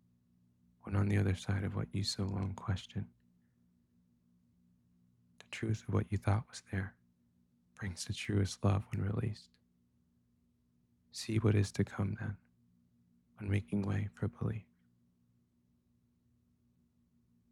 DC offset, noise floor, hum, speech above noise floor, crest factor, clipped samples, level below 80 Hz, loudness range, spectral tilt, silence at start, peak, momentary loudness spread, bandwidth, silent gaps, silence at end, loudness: under 0.1%; -74 dBFS; 60 Hz at -65 dBFS; 39 dB; 22 dB; under 0.1%; -62 dBFS; 7 LU; -6 dB/octave; 0.85 s; -18 dBFS; 13 LU; 12 kHz; none; 2.9 s; -37 LUFS